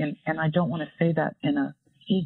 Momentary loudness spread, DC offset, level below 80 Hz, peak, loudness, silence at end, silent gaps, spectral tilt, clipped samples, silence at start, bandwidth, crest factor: 4 LU; under 0.1%; -68 dBFS; -10 dBFS; -27 LUFS; 0 s; none; -10.5 dB/octave; under 0.1%; 0 s; 4.2 kHz; 16 dB